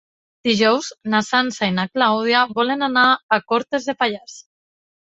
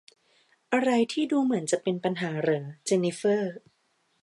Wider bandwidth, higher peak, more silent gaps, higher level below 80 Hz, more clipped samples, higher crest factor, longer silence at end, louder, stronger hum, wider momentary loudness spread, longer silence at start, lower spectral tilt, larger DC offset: second, 8 kHz vs 11.5 kHz; first, -2 dBFS vs -10 dBFS; first, 3.23-3.29 s vs none; first, -62 dBFS vs -78 dBFS; neither; about the same, 18 dB vs 18 dB; about the same, 0.6 s vs 0.65 s; first, -18 LUFS vs -27 LUFS; neither; about the same, 7 LU vs 5 LU; second, 0.45 s vs 0.7 s; about the same, -4 dB/octave vs -5 dB/octave; neither